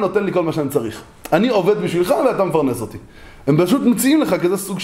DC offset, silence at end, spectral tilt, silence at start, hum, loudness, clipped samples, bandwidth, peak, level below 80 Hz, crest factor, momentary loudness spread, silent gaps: under 0.1%; 0 s; -5.5 dB/octave; 0 s; none; -17 LUFS; under 0.1%; 16 kHz; -2 dBFS; -48 dBFS; 16 dB; 12 LU; none